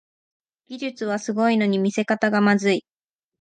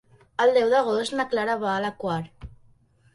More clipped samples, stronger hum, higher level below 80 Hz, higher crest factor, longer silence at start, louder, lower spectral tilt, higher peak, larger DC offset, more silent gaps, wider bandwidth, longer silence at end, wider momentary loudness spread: neither; neither; second, -72 dBFS vs -56 dBFS; about the same, 16 dB vs 16 dB; first, 0.7 s vs 0.4 s; about the same, -22 LUFS vs -24 LUFS; about the same, -5.5 dB/octave vs -5 dB/octave; about the same, -6 dBFS vs -8 dBFS; neither; neither; second, 9.2 kHz vs 11.5 kHz; about the same, 0.6 s vs 0.65 s; about the same, 12 LU vs 11 LU